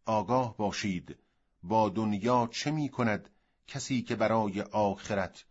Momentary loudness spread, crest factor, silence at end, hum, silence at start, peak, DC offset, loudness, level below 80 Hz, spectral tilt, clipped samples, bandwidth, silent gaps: 10 LU; 18 dB; 0.1 s; none; 0.05 s; -14 dBFS; under 0.1%; -31 LUFS; -64 dBFS; -5.5 dB/octave; under 0.1%; 8 kHz; none